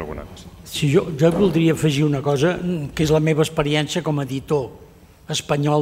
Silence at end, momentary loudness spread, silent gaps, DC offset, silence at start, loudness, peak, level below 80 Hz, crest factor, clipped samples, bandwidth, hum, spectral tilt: 0 s; 12 LU; none; under 0.1%; 0 s; -20 LUFS; -4 dBFS; -44 dBFS; 16 dB; under 0.1%; 16 kHz; none; -6 dB/octave